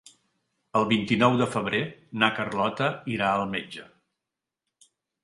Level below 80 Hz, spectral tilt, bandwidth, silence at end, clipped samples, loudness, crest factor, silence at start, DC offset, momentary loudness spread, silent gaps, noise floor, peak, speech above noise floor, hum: -62 dBFS; -5.5 dB/octave; 11.5 kHz; 1.4 s; under 0.1%; -25 LUFS; 24 dB; 0.75 s; under 0.1%; 11 LU; none; -87 dBFS; -4 dBFS; 62 dB; none